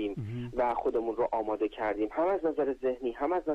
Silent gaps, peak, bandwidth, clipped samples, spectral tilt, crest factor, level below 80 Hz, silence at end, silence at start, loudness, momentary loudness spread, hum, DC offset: none; -20 dBFS; 8.4 kHz; under 0.1%; -8.5 dB/octave; 10 dB; -56 dBFS; 0 s; 0 s; -31 LUFS; 4 LU; none; under 0.1%